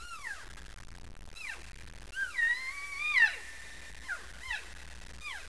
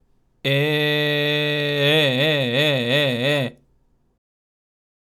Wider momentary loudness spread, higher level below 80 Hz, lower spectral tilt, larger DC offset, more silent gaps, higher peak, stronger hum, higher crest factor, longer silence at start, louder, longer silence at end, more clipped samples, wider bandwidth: first, 24 LU vs 5 LU; first, -54 dBFS vs -64 dBFS; second, -1 dB/octave vs -5.5 dB/octave; first, 0.4% vs under 0.1%; neither; second, -14 dBFS vs -6 dBFS; neither; first, 22 dB vs 16 dB; second, 0 s vs 0.45 s; second, -32 LUFS vs -19 LUFS; second, 0 s vs 1.65 s; neither; second, 11 kHz vs 16 kHz